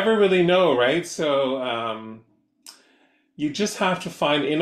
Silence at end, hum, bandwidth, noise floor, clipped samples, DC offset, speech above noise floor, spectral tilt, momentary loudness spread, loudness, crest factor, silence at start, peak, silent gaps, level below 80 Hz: 0 s; none; 14 kHz; -61 dBFS; under 0.1%; under 0.1%; 40 dB; -4.5 dB/octave; 12 LU; -22 LUFS; 14 dB; 0 s; -8 dBFS; none; -66 dBFS